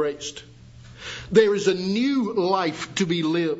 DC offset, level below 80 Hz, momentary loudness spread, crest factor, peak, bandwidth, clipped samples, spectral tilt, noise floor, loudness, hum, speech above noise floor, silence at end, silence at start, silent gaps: under 0.1%; -56 dBFS; 16 LU; 20 dB; -4 dBFS; 8 kHz; under 0.1%; -5 dB/octave; -45 dBFS; -22 LUFS; none; 22 dB; 0 s; 0 s; none